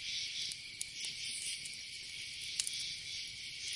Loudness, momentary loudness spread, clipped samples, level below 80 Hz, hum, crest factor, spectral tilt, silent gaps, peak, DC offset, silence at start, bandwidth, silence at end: -40 LUFS; 6 LU; under 0.1%; -72 dBFS; none; 28 dB; 2 dB/octave; none; -14 dBFS; under 0.1%; 0 s; 11.5 kHz; 0 s